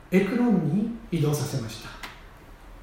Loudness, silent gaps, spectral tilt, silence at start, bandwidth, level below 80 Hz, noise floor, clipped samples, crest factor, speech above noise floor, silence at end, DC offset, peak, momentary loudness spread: -26 LUFS; none; -6.5 dB/octave; 0.05 s; 16.5 kHz; -50 dBFS; -46 dBFS; under 0.1%; 18 dB; 22 dB; 0 s; under 0.1%; -8 dBFS; 17 LU